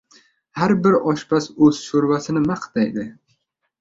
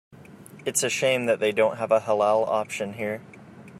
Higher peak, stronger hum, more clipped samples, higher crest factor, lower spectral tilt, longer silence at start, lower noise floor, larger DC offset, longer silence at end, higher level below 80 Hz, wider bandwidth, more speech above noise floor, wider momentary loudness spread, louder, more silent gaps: first, -2 dBFS vs -8 dBFS; neither; neither; about the same, 18 dB vs 18 dB; first, -6.5 dB/octave vs -3 dB/octave; first, 0.55 s vs 0.15 s; first, -68 dBFS vs -46 dBFS; neither; first, 0.7 s vs 0 s; first, -56 dBFS vs -70 dBFS; second, 7.8 kHz vs 16 kHz; first, 50 dB vs 22 dB; about the same, 9 LU vs 10 LU; first, -19 LUFS vs -24 LUFS; neither